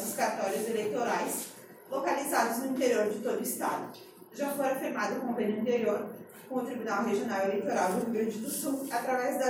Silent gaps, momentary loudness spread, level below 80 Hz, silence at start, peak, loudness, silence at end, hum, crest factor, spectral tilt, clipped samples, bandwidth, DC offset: none; 9 LU; -82 dBFS; 0 s; -14 dBFS; -31 LUFS; 0 s; none; 16 dB; -4 dB/octave; under 0.1%; 16.5 kHz; under 0.1%